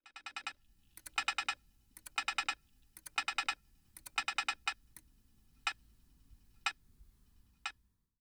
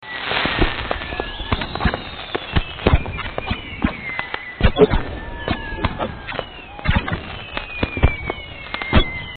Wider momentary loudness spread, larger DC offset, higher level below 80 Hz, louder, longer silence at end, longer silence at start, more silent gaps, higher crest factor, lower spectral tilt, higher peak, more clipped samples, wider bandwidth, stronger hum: first, 21 LU vs 10 LU; neither; second, -68 dBFS vs -26 dBFS; second, -39 LUFS vs -22 LUFS; first, 0.5 s vs 0 s; about the same, 0.05 s vs 0 s; neither; about the same, 24 dB vs 22 dB; second, 1.5 dB/octave vs -9.5 dB/octave; second, -20 dBFS vs 0 dBFS; neither; first, over 20 kHz vs 4.7 kHz; neither